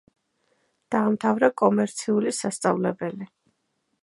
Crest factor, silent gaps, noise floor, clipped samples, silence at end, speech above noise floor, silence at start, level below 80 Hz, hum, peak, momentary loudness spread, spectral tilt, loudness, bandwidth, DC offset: 20 dB; none; -74 dBFS; under 0.1%; 0.75 s; 51 dB; 0.9 s; -74 dBFS; none; -4 dBFS; 12 LU; -5.5 dB/octave; -24 LUFS; 11.5 kHz; under 0.1%